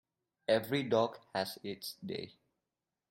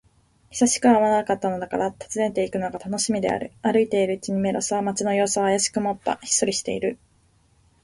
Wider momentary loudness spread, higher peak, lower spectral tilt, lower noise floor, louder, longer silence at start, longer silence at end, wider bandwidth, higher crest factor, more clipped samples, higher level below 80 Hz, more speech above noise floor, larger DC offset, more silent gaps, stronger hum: first, 12 LU vs 9 LU; second, -16 dBFS vs -6 dBFS; first, -5 dB/octave vs -3.5 dB/octave; first, -90 dBFS vs -61 dBFS; second, -36 LUFS vs -23 LUFS; about the same, 0.5 s vs 0.5 s; about the same, 0.8 s vs 0.9 s; first, 16.5 kHz vs 11.5 kHz; about the same, 20 dB vs 18 dB; neither; second, -78 dBFS vs -58 dBFS; first, 55 dB vs 38 dB; neither; neither; neither